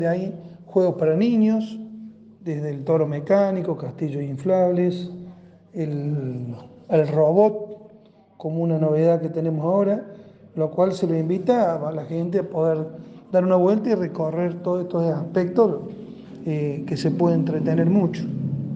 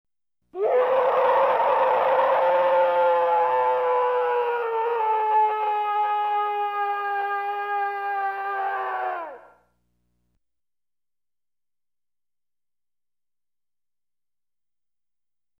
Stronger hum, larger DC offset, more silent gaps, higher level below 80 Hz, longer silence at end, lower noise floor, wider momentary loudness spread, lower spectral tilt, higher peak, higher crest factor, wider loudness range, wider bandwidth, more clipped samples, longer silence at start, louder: neither; neither; neither; first, -66 dBFS vs -76 dBFS; second, 0 s vs 6.2 s; second, -51 dBFS vs under -90 dBFS; first, 16 LU vs 7 LU; first, -9 dB/octave vs -4.5 dB/octave; first, -4 dBFS vs -10 dBFS; about the same, 18 dB vs 14 dB; second, 2 LU vs 11 LU; second, 8 kHz vs 14.5 kHz; neither; second, 0 s vs 0.55 s; about the same, -22 LUFS vs -23 LUFS